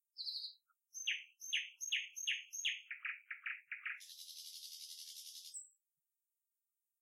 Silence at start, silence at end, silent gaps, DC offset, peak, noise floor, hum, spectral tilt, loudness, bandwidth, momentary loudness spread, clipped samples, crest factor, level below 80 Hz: 0.15 s; 1.3 s; none; under 0.1%; -26 dBFS; under -90 dBFS; none; 9 dB/octave; -43 LUFS; 16 kHz; 11 LU; under 0.1%; 22 dB; under -90 dBFS